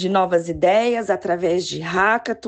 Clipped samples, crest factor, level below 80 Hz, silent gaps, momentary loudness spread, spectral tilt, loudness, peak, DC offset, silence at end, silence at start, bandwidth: under 0.1%; 14 dB; -50 dBFS; none; 5 LU; -5 dB/octave; -19 LUFS; -6 dBFS; under 0.1%; 0 s; 0 s; 9 kHz